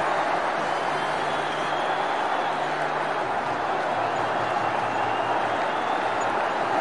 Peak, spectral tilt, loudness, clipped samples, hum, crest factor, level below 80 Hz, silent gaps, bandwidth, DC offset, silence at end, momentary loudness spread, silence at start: -12 dBFS; -4 dB/octave; -25 LUFS; under 0.1%; none; 14 dB; -66 dBFS; none; 11.5 kHz; 0.3%; 0 s; 1 LU; 0 s